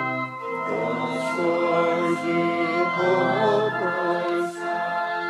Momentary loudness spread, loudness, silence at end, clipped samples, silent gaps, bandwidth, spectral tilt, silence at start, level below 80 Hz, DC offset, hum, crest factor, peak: 6 LU; -23 LUFS; 0 s; under 0.1%; none; 12 kHz; -6 dB/octave; 0 s; -80 dBFS; under 0.1%; none; 14 dB; -10 dBFS